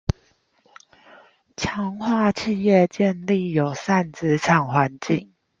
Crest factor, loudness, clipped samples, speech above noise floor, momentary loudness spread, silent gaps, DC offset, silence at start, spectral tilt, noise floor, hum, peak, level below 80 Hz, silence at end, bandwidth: 20 dB; -21 LUFS; under 0.1%; 41 dB; 10 LU; none; under 0.1%; 1.6 s; -6.5 dB/octave; -62 dBFS; none; -4 dBFS; -48 dBFS; 0.35 s; 7.6 kHz